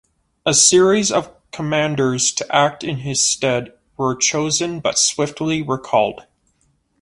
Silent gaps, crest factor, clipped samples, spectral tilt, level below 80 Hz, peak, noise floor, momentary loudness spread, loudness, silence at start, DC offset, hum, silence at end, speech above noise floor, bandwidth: none; 18 dB; under 0.1%; -3 dB/octave; -54 dBFS; 0 dBFS; -63 dBFS; 12 LU; -17 LUFS; 0.45 s; under 0.1%; none; 0.8 s; 45 dB; 11.5 kHz